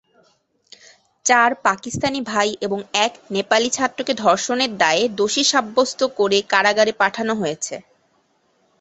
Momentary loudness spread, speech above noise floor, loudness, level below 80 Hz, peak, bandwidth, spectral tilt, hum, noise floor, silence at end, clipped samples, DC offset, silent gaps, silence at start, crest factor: 8 LU; 44 dB; -19 LUFS; -60 dBFS; -2 dBFS; 8.4 kHz; -2 dB/octave; none; -63 dBFS; 1 s; under 0.1%; under 0.1%; none; 1.25 s; 18 dB